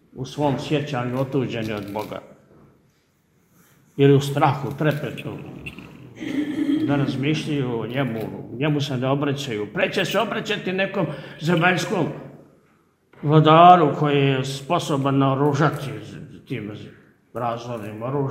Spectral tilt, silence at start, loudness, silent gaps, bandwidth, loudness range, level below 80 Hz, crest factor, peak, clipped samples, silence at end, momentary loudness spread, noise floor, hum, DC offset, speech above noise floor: -6.5 dB/octave; 0.15 s; -21 LUFS; none; 16 kHz; 8 LU; -58 dBFS; 22 dB; 0 dBFS; under 0.1%; 0 s; 17 LU; -63 dBFS; none; under 0.1%; 42 dB